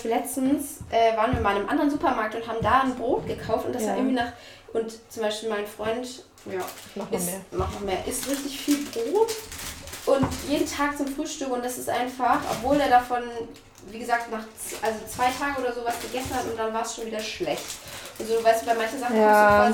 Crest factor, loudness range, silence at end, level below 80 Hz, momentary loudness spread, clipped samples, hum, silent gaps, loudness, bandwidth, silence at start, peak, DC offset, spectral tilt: 20 dB; 6 LU; 0 s; -50 dBFS; 13 LU; under 0.1%; none; none; -26 LUFS; 18 kHz; 0 s; -6 dBFS; under 0.1%; -4 dB/octave